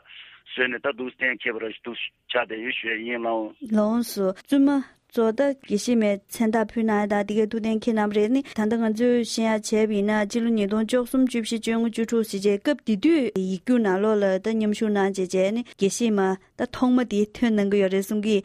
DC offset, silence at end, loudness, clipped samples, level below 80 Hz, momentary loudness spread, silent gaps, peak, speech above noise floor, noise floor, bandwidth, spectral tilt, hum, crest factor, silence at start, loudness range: under 0.1%; 0.05 s; -24 LUFS; under 0.1%; -60 dBFS; 6 LU; none; -8 dBFS; 24 dB; -47 dBFS; 15 kHz; -5 dB/octave; none; 14 dB; 0.1 s; 3 LU